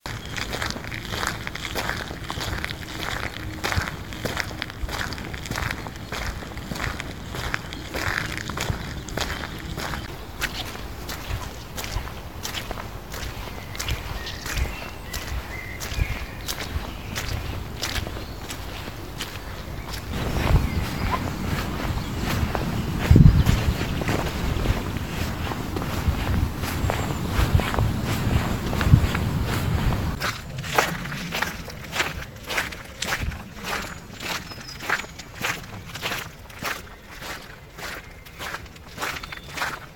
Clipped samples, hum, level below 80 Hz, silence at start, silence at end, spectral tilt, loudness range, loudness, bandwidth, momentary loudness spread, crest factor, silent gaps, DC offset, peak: under 0.1%; none; -32 dBFS; 0 s; 0 s; -5 dB/octave; 10 LU; -27 LUFS; 19 kHz; 11 LU; 26 dB; none; 0.5%; 0 dBFS